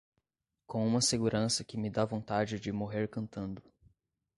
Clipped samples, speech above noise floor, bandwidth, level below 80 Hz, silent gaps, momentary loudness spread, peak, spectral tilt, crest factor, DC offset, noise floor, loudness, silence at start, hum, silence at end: under 0.1%; 53 dB; 11.5 kHz; -62 dBFS; none; 12 LU; -16 dBFS; -4.5 dB/octave; 20 dB; under 0.1%; -85 dBFS; -33 LUFS; 0.7 s; none; 0.75 s